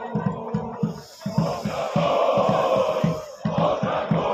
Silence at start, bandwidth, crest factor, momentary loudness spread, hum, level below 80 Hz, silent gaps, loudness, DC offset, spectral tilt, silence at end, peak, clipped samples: 0 s; 14.5 kHz; 16 dB; 9 LU; none; -52 dBFS; none; -24 LUFS; under 0.1%; -7 dB/octave; 0 s; -8 dBFS; under 0.1%